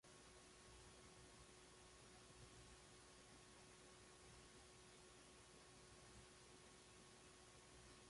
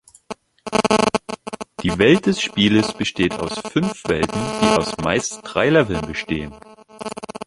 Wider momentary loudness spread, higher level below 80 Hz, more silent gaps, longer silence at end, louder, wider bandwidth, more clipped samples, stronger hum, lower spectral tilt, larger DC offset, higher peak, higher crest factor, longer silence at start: second, 1 LU vs 16 LU; second, -76 dBFS vs -44 dBFS; neither; about the same, 0 s vs 0.05 s; second, -65 LUFS vs -19 LUFS; about the same, 11.5 kHz vs 11.5 kHz; neither; neither; second, -3 dB/octave vs -4.5 dB/octave; neither; second, -50 dBFS vs -2 dBFS; about the same, 14 dB vs 18 dB; second, 0.05 s vs 0.3 s